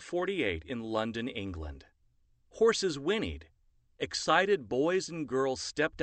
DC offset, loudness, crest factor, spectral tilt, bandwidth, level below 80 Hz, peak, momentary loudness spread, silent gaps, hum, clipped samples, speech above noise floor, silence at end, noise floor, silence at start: under 0.1%; -31 LUFS; 22 dB; -4 dB/octave; 8.8 kHz; -54 dBFS; -10 dBFS; 12 LU; none; none; under 0.1%; 37 dB; 0 s; -69 dBFS; 0 s